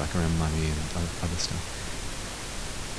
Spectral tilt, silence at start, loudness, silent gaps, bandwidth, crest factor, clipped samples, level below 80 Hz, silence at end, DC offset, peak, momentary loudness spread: -4.5 dB/octave; 0 s; -31 LUFS; none; 11 kHz; 16 dB; under 0.1%; -36 dBFS; 0 s; 0.7%; -14 dBFS; 8 LU